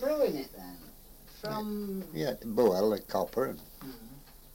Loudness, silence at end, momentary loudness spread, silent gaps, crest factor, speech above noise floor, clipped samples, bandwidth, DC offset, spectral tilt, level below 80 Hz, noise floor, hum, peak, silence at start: -32 LUFS; 0 s; 24 LU; none; 18 dB; 21 dB; under 0.1%; 17 kHz; under 0.1%; -6 dB/octave; -56 dBFS; -52 dBFS; none; -14 dBFS; 0 s